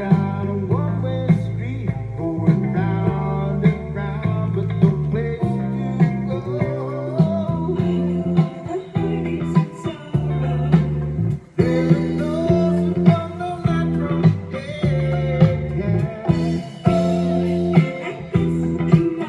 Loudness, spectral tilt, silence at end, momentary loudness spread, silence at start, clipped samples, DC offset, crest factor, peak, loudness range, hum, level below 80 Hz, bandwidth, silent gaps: -20 LUFS; -9 dB/octave; 0 s; 7 LU; 0 s; under 0.1%; under 0.1%; 18 dB; 0 dBFS; 2 LU; none; -40 dBFS; 7.8 kHz; none